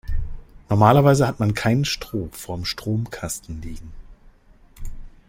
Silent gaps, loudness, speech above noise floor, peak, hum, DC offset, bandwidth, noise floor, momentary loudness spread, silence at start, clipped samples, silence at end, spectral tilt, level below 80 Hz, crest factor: none; -21 LUFS; 30 dB; -2 dBFS; none; under 0.1%; 16.5 kHz; -51 dBFS; 25 LU; 0.05 s; under 0.1%; 0.2 s; -6 dB/octave; -34 dBFS; 20 dB